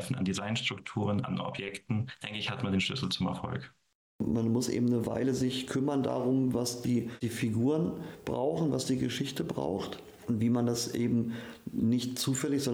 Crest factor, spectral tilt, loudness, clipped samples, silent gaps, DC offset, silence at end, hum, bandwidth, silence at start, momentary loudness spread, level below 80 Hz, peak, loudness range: 12 dB; -5.5 dB/octave; -32 LUFS; under 0.1%; 3.95-4.19 s; under 0.1%; 0 s; none; 17.5 kHz; 0 s; 8 LU; -62 dBFS; -18 dBFS; 3 LU